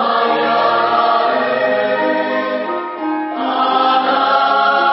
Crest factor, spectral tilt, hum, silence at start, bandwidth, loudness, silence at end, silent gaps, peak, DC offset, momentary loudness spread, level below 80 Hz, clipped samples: 14 dB; -8.5 dB/octave; none; 0 s; 5.8 kHz; -15 LUFS; 0 s; none; -2 dBFS; under 0.1%; 7 LU; -78 dBFS; under 0.1%